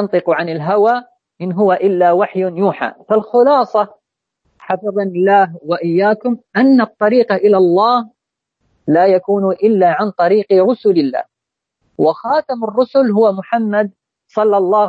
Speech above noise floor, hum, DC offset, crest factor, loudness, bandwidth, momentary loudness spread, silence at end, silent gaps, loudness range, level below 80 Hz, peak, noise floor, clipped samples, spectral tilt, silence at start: 68 dB; none; under 0.1%; 12 dB; -14 LUFS; 7.2 kHz; 8 LU; 0 s; none; 3 LU; -68 dBFS; -2 dBFS; -81 dBFS; under 0.1%; -8.5 dB/octave; 0 s